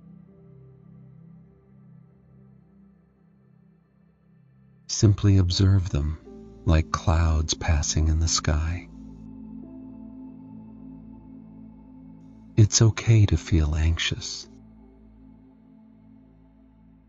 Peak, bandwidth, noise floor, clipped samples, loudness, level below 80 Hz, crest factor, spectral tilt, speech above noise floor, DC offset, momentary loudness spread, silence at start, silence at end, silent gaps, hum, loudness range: -6 dBFS; 8 kHz; -60 dBFS; under 0.1%; -23 LUFS; -34 dBFS; 20 dB; -5 dB/octave; 39 dB; under 0.1%; 25 LU; 4.9 s; 2.65 s; none; none; 12 LU